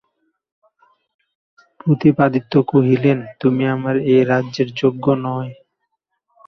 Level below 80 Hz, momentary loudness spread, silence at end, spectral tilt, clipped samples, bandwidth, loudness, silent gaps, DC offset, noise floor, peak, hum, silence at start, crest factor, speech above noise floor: -58 dBFS; 8 LU; 0.95 s; -8.5 dB/octave; under 0.1%; 6.4 kHz; -17 LUFS; none; under 0.1%; -73 dBFS; -2 dBFS; none; 1.85 s; 16 dB; 58 dB